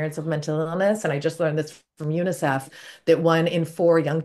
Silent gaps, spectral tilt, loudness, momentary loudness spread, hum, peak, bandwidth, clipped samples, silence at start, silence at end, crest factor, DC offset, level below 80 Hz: none; -6.5 dB/octave; -23 LUFS; 10 LU; none; -6 dBFS; 12.5 kHz; under 0.1%; 0 s; 0 s; 18 dB; under 0.1%; -70 dBFS